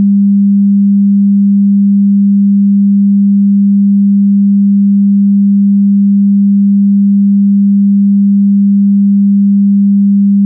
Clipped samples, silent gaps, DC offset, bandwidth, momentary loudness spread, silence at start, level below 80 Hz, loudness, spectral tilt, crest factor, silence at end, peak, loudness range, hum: under 0.1%; none; under 0.1%; 0.3 kHz; 0 LU; 0 s; -74 dBFS; -8 LUFS; -18 dB/octave; 4 dB; 0 s; -4 dBFS; 0 LU; none